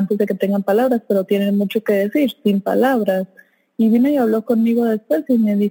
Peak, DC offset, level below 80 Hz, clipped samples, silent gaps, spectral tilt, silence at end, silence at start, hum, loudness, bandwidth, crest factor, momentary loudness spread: -4 dBFS; under 0.1%; -74 dBFS; under 0.1%; none; -7.5 dB/octave; 0 s; 0 s; none; -17 LUFS; 17 kHz; 12 dB; 4 LU